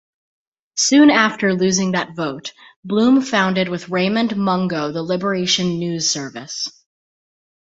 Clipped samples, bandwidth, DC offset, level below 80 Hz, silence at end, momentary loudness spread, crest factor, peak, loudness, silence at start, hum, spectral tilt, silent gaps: under 0.1%; 8.2 kHz; under 0.1%; -60 dBFS; 1.05 s; 13 LU; 18 dB; -2 dBFS; -18 LUFS; 0.75 s; none; -4 dB/octave; 2.76-2.83 s